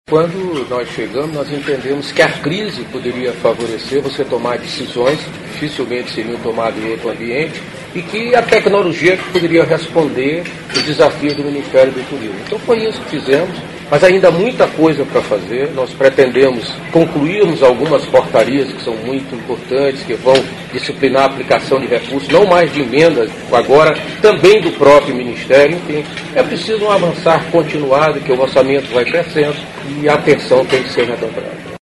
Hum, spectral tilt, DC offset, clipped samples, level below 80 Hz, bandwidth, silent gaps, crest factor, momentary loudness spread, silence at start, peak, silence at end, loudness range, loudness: none; -5.5 dB/octave; under 0.1%; 0.2%; -46 dBFS; 12 kHz; none; 14 dB; 11 LU; 0.1 s; 0 dBFS; 0.05 s; 7 LU; -13 LUFS